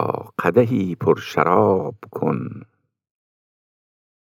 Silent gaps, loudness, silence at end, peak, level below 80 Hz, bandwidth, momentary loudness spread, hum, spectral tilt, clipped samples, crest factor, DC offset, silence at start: none; -20 LUFS; 1.7 s; 0 dBFS; -68 dBFS; 16 kHz; 12 LU; none; -8 dB/octave; under 0.1%; 20 dB; under 0.1%; 0 s